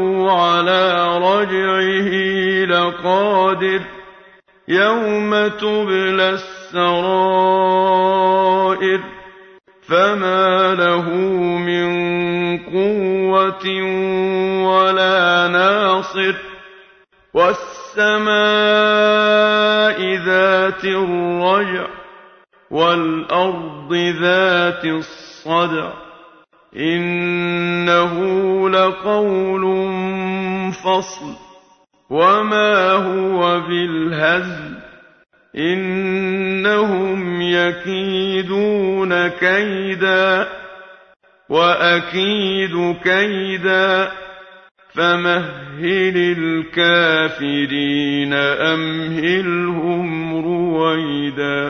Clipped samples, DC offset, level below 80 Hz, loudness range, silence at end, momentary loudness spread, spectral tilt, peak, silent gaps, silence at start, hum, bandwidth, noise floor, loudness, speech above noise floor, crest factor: under 0.1%; under 0.1%; -56 dBFS; 4 LU; 0 s; 8 LU; -5.5 dB/octave; 0 dBFS; 44.71-44.75 s; 0 s; none; 6.6 kHz; -53 dBFS; -16 LUFS; 37 dB; 16 dB